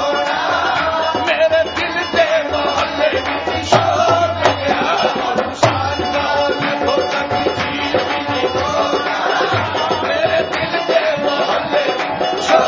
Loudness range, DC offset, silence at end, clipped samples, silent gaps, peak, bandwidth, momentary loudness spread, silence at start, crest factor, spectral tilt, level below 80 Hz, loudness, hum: 2 LU; under 0.1%; 0 s; under 0.1%; none; 0 dBFS; 7.8 kHz; 4 LU; 0 s; 16 dB; -4 dB/octave; -42 dBFS; -16 LUFS; none